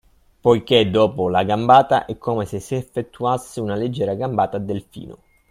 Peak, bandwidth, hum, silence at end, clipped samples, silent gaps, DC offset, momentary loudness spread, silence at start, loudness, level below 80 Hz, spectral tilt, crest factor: 0 dBFS; 15.5 kHz; none; 0.35 s; under 0.1%; none; under 0.1%; 13 LU; 0.45 s; -19 LUFS; -52 dBFS; -6 dB/octave; 20 dB